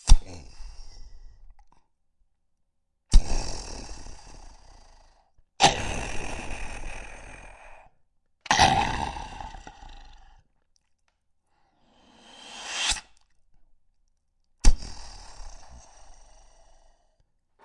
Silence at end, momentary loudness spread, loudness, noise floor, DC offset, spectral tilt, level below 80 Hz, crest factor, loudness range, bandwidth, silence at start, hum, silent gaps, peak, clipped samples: 1.55 s; 27 LU; -27 LUFS; -73 dBFS; under 0.1%; -3 dB/octave; -30 dBFS; 24 dB; 8 LU; 11.5 kHz; 0.05 s; none; none; -2 dBFS; under 0.1%